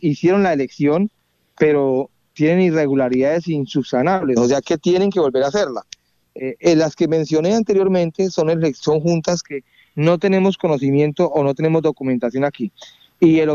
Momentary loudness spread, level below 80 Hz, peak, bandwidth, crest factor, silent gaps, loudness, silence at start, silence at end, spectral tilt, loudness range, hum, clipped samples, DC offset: 7 LU; -56 dBFS; -2 dBFS; 7.4 kHz; 16 dB; none; -17 LUFS; 0 s; 0 s; -6.5 dB/octave; 1 LU; none; under 0.1%; under 0.1%